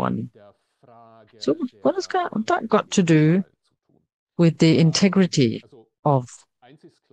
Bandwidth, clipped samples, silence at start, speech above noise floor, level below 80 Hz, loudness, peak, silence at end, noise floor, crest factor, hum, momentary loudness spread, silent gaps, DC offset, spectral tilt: 9.2 kHz; under 0.1%; 0 s; 46 dB; -64 dBFS; -20 LUFS; -4 dBFS; 0.8 s; -66 dBFS; 18 dB; none; 15 LU; 4.14-4.27 s, 5.99-6.03 s; under 0.1%; -6 dB/octave